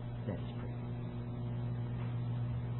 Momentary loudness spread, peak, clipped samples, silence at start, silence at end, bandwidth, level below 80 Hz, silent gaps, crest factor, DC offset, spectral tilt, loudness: 4 LU; -28 dBFS; under 0.1%; 0 s; 0 s; 4 kHz; -52 dBFS; none; 12 dB; under 0.1%; -8.5 dB/octave; -40 LUFS